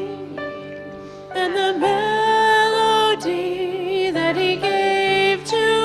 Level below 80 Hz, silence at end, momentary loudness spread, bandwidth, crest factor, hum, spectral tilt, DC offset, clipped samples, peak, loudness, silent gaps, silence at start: -58 dBFS; 0 s; 15 LU; 13.5 kHz; 14 dB; none; -3.5 dB/octave; under 0.1%; under 0.1%; -6 dBFS; -18 LUFS; none; 0 s